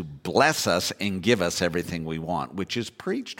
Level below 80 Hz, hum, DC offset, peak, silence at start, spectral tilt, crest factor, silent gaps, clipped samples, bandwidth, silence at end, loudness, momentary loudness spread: -54 dBFS; none; under 0.1%; -6 dBFS; 0 s; -4 dB/octave; 20 dB; none; under 0.1%; 17 kHz; 0.05 s; -25 LUFS; 9 LU